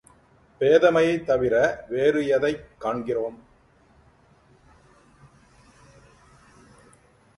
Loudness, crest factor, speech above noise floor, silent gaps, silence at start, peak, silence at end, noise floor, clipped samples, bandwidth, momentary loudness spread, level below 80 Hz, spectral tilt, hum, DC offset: -22 LUFS; 20 dB; 36 dB; none; 0.6 s; -6 dBFS; 4.05 s; -58 dBFS; under 0.1%; 11.5 kHz; 12 LU; -56 dBFS; -6 dB/octave; none; under 0.1%